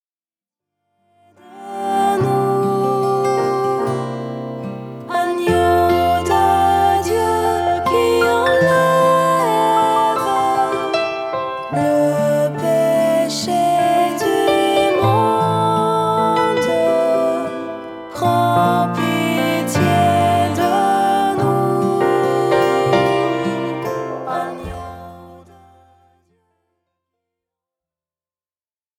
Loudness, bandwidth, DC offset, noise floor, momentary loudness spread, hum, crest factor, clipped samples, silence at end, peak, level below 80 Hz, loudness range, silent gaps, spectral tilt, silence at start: -16 LUFS; 17 kHz; under 0.1%; under -90 dBFS; 10 LU; none; 16 dB; under 0.1%; 3.6 s; -2 dBFS; -48 dBFS; 5 LU; none; -5.5 dB/octave; 1.5 s